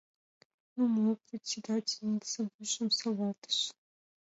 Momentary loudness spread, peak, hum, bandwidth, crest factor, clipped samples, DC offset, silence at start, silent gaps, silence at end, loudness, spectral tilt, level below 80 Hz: 8 LU; -20 dBFS; none; 8 kHz; 16 dB; under 0.1%; under 0.1%; 0.75 s; 2.54-2.59 s, 3.38-3.42 s; 0.5 s; -33 LUFS; -3.5 dB/octave; -84 dBFS